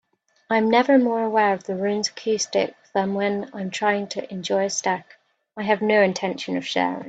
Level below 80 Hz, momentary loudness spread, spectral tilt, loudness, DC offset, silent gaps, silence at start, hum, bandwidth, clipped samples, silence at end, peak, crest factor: -68 dBFS; 10 LU; -4 dB/octave; -22 LUFS; under 0.1%; none; 0.5 s; none; 9 kHz; under 0.1%; 0 s; -4 dBFS; 18 dB